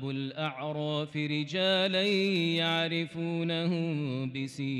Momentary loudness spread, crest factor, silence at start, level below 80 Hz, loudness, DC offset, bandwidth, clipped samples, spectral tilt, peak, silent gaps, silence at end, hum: 8 LU; 12 dB; 0 s; -76 dBFS; -30 LUFS; under 0.1%; 12 kHz; under 0.1%; -6 dB/octave; -18 dBFS; none; 0 s; none